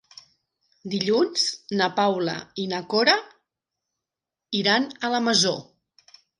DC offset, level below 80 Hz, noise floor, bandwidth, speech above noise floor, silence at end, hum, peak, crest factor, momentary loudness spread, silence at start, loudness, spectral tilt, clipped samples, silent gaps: under 0.1%; -72 dBFS; -88 dBFS; 11.5 kHz; 65 dB; 0.75 s; none; -6 dBFS; 20 dB; 10 LU; 0.85 s; -23 LUFS; -3 dB/octave; under 0.1%; none